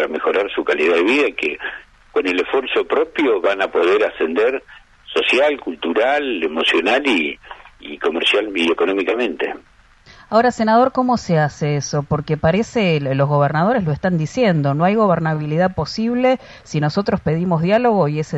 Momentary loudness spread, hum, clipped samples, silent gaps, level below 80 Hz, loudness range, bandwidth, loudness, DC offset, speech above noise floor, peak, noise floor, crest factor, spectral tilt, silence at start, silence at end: 7 LU; none; under 0.1%; none; -48 dBFS; 1 LU; 10 kHz; -17 LUFS; under 0.1%; 29 dB; -2 dBFS; -47 dBFS; 14 dB; -6 dB/octave; 0 s; 0 s